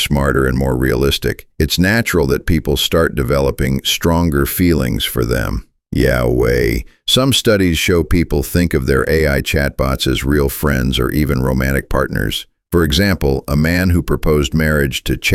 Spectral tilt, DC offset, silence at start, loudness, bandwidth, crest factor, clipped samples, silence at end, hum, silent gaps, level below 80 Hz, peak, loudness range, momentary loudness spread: -5 dB/octave; under 0.1%; 0 s; -15 LUFS; 17 kHz; 14 dB; under 0.1%; 0 s; none; none; -24 dBFS; -2 dBFS; 2 LU; 5 LU